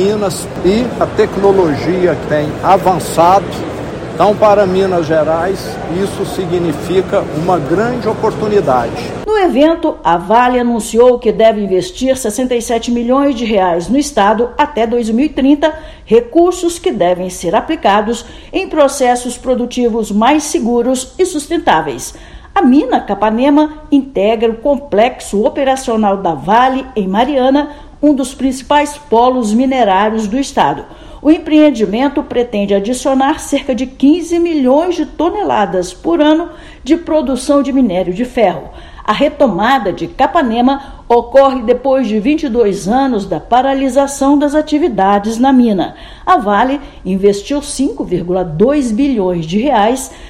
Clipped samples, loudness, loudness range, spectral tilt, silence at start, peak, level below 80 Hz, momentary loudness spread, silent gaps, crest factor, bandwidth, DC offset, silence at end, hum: 0.4%; -12 LUFS; 2 LU; -5.5 dB/octave; 0 s; 0 dBFS; -36 dBFS; 7 LU; none; 12 dB; 16 kHz; under 0.1%; 0 s; none